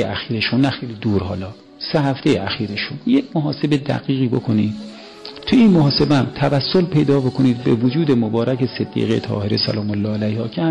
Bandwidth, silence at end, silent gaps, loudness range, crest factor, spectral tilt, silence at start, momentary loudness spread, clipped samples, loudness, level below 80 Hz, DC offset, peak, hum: 10 kHz; 0 s; none; 4 LU; 12 dB; -7.5 dB/octave; 0 s; 9 LU; under 0.1%; -18 LUFS; -48 dBFS; under 0.1%; -6 dBFS; none